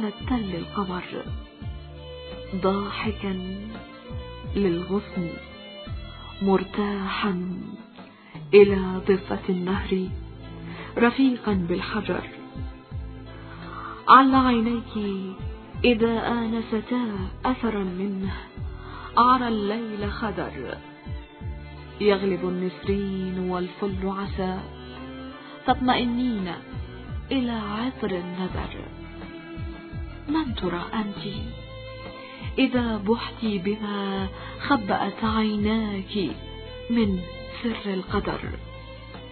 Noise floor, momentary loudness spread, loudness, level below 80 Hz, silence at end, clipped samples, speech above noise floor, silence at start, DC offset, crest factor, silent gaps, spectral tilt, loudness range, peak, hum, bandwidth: -46 dBFS; 17 LU; -25 LUFS; -42 dBFS; 0 s; under 0.1%; 22 dB; 0 s; under 0.1%; 24 dB; none; -10.5 dB/octave; 9 LU; 0 dBFS; none; 4.5 kHz